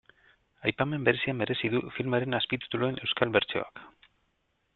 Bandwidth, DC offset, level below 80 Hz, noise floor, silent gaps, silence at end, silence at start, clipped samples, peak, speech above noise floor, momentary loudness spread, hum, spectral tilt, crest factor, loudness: 4.4 kHz; under 0.1%; -64 dBFS; -75 dBFS; none; 0.85 s; 0.6 s; under 0.1%; -6 dBFS; 46 dB; 6 LU; none; -9 dB/octave; 24 dB; -29 LUFS